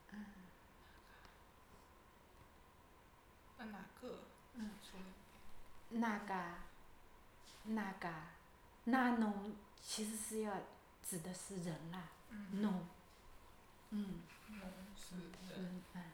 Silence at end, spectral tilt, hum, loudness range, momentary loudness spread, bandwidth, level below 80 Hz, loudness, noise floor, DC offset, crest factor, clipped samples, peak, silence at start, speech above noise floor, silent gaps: 0 s; -4.5 dB/octave; none; 16 LU; 24 LU; over 20 kHz; -68 dBFS; -46 LUFS; -66 dBFS; under 0.1%; 22 dB; under 0.1%; -24 dBFS; 0 s; 21 dB; none